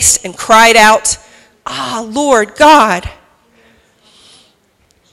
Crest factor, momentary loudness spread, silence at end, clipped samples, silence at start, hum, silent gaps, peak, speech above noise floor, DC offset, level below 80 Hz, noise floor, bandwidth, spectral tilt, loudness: 12 dB; 16 LU; 2 s; 1%; 0 s; none; none; 0 dBFS; 45 dB; under 0.1%; -40 dBFS; -54 dBFS; over 20 kHz; -1.5 dB/octave; -9 LUFS